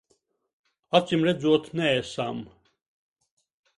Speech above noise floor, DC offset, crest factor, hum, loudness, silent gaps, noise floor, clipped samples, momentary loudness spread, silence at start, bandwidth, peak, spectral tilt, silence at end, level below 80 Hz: 47 dB; under 0.1%; 24 dB; none; -25 LUFS; none; -71 dBFS; under 0.1%; 10 LU; 0.95 s; 11.5 kHz; -4 dBFS; -6 dB/octave; 1.3 s; -66 dBFS